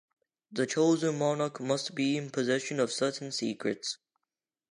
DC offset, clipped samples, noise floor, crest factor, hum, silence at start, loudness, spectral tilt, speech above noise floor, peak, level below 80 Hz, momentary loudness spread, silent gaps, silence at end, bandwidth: under 0.1%; under 0.1%; -89 dBFS; 16 dB; none; 0.5 s; -31 LUFS; -4.5 dB/octave; 59 dB; -14 dBFS; -82 dBFS; 8 LU; none; 0.75 s; 11.5 kHz